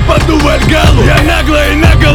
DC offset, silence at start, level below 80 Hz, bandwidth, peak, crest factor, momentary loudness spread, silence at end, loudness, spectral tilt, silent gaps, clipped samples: under 0.1%; 0 s; -12 dBFS; 17.5 kHz; 0 dBFS; 6 dB; 2 LU; 0 s; -8 LUFS; -5.5 dB/octave; none; 3%